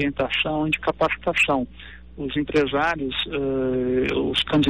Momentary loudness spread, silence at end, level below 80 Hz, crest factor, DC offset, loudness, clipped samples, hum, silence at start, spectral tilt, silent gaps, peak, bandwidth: 8 LU; 0 s; -44 dBFS; 12 dB; 0.4%; -23 LUFS; under 0.1%; none; 0 s; -5.5 dB/octave; none; -12 dBFS; 14 kHz